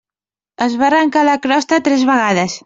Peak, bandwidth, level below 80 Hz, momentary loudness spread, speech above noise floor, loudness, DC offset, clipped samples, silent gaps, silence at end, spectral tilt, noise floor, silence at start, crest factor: -2 dBFS; 7.8 kHz; -58 dBFS; 4 LU; over 77 dB; -14 LUFS; under 0.1%; under 0.1%; none; 0.05 s; -4.5 dB/octave; under -90 dBFS; 0.6 s; 12 dB